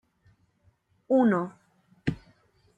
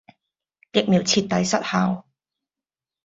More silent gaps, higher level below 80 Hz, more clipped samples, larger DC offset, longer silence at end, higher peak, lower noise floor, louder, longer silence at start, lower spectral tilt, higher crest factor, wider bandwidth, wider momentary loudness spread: neither; about the same, -58 dBFS vs -60 dBFS; neither; neither; second, 0.65 s vs 1.05 s; second, -12 dBFS vs -4 dBFS; second, -67 dBFS vs under -90 dBFS; second, -27 LUFS vs -21 LUFS; first, 1.1 s vs 0.75 s; first, -9 dB/octave vs -4.5 dB/octave; about the same, 18 dB vs 20 dB; first, 8.8 kHz vs 7.8 kHz; first, 16 LU vs 6 LU